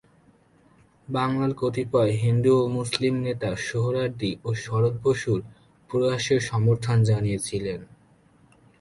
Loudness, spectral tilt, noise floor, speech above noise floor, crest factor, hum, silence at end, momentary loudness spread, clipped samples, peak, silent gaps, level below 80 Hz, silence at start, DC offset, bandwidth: -24 LUFS; -6.5 dB/octave; -58 dBFS; 35 dB; 20 dB; none; 0.95 s; 8 LU; under 0.1%; -4 dBFS; none; -54 dBFS; 1.1 s; under 0.1%; 11.5 kHz